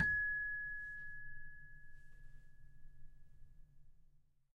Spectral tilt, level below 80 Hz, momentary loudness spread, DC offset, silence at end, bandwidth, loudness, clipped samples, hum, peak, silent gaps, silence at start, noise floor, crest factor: -5.5 dB/octave; -58 dBFS; 27 LU; under 0.1%; 0.3 s; 5.4 kHz; -41 LUFS; under 0.1%; none; -24 dBFS; none; 0 s; -68 dBFS; 22 dB